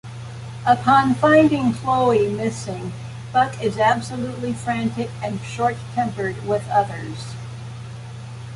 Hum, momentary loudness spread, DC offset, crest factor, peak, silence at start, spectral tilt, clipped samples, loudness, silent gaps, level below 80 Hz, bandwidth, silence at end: none; 19 LU; under 0.1%; 18 dB; -4 dBFS; 0.05 s; -6 dB/octave; under 0.1%; -20 LUFS; none; -50 dBFS; 11.5 kHz; 0 s